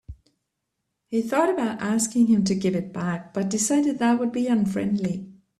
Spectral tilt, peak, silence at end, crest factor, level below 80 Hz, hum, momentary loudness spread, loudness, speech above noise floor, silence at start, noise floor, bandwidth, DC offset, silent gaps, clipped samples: -5 dB/octave; -6 dBFS; 0.25 s; 18 dB; -58 dBFS; none; 9 LU; -23 LUFS; 57 dB; 0.1 s; -80 dBFS; 13.5 kHz; under 0.1%; none; under 0.1%